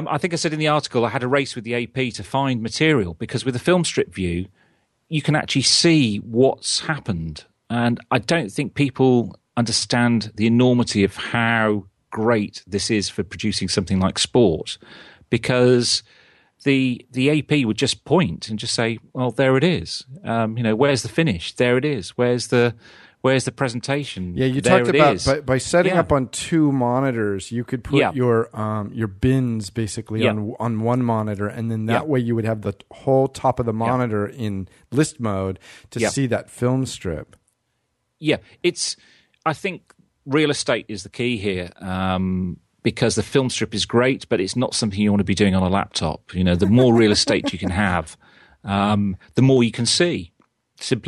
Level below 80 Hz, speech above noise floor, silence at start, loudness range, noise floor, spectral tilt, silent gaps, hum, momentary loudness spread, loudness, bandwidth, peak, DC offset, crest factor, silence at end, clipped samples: -48 dBFS; 52 dB; 0 s; 5 LU; -72 dBFS; -5 dB/octave; none; none; 10 LU; -20 LUFS; 12.5 kHz; 0 dBFS; under 0.1%; 20 dB; 0 s; under 0.1%